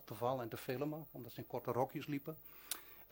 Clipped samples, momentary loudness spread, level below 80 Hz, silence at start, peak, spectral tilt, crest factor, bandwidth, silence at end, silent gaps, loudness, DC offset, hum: under 0.1%; 11 LU; -74 dBFS; 0 s; -20 dBFS; -5.5 dB/octave; 24 dB; 17 kHz; 0 s; none; -44 LUFS; under 0.1%; none